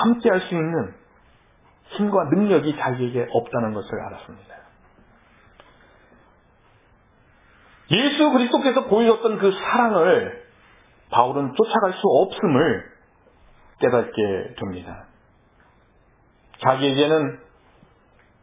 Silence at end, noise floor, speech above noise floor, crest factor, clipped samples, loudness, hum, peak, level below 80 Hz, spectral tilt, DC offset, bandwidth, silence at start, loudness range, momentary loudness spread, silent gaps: 1.05 s; -57 dBFS; 37 dB; 22 dB; under 0.1%; -20 LUFS; none; 0 dBFS; -58 dBFS; -10 dB/octave; under 0.1%; 3.9 kHz; 0 s; 9 LU; 15 LU; none